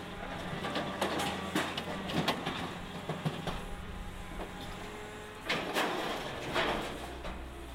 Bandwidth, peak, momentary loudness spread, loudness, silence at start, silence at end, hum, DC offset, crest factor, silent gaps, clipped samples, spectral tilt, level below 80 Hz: 16 kHz; -14 dBFS; 11 LU; -36 LUFS; 0 s; 0 s; none; under 0.1%; 22 dB; none; under 0.1%; -4.5 dB/octave; -50 dBFS